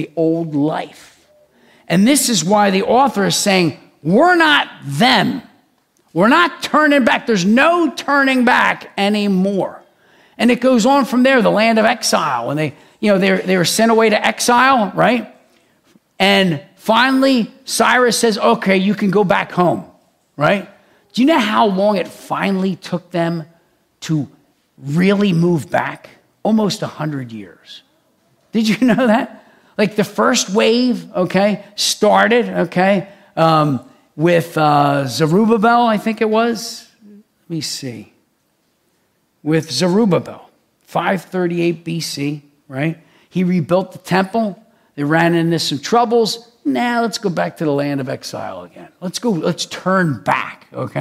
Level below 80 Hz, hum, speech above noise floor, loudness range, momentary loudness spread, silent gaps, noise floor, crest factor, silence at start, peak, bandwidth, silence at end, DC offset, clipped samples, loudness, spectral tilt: -60 dBFS; none; 48 dB; 6 LU; 13 LU; none; -63 dBFS; 16 dB; 0 s; 0 dBFS; 16 kHz; 0 s; under 0.1%; under 0.1%; -15 LUFS; -4.5 dB/octave